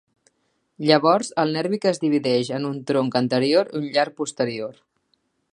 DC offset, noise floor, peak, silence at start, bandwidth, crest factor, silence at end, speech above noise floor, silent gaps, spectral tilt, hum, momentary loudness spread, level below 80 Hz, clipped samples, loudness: under 0.1%; -70 dBFS; 0 dBFS; 0.8 s; 11.5 kHz; 22 dB; 0.85 s; 49 dB; none; -5 dB/octave; none; 8 LU; -72 dBFS; under 0.1%; -22 LUFS